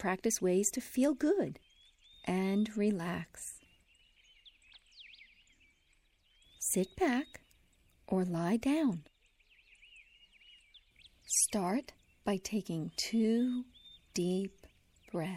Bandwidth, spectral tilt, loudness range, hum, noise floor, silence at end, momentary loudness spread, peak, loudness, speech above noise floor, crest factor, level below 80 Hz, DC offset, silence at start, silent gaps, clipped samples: 16.5 kHz; -4.5 dB/octave; 6 LU; none; -71 dBFS; 0 s; 15 LU; -18 dBFS; -34 LUFS; 38 dB; 18 dB; -68 dBFS; under 0.1%; 0 s; none; under 0.1%